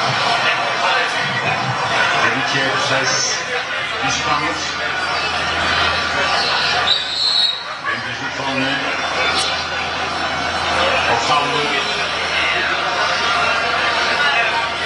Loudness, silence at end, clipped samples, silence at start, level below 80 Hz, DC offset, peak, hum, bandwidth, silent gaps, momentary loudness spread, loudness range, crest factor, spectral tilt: -16 LUFS; 0 s; under 0.1%; 0 s; -50 dBFS; under 0.1%; -2 dBFS; none; 11.5 kHz; none; 5 LU; 2 LU; 16 dB; -2 dB/octave